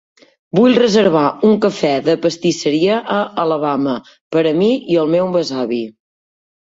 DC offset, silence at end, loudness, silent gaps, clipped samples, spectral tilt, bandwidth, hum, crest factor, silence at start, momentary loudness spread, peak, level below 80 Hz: under 0.1%; 0.75 s; -15 LUFS; 4.21-4.31 s; under 0.1%; -5.5 dB/octave; 7.8 kHz; none; 14 dB; 0.55 s; 8 LU; -2 dBFS; -58 dBFS